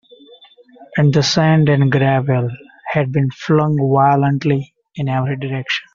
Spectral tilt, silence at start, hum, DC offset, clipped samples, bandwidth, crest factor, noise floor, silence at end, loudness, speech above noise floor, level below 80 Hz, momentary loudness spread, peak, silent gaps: -6 dB/octave; 0.8 s; none; under 0.1%; under 0.1%; 7.4 kHz; 14 dB; -45 dBFS; 0.15 s; -16 LUFS; 30 dB; -52 dBFS; 10 LU; -2 dBFS; none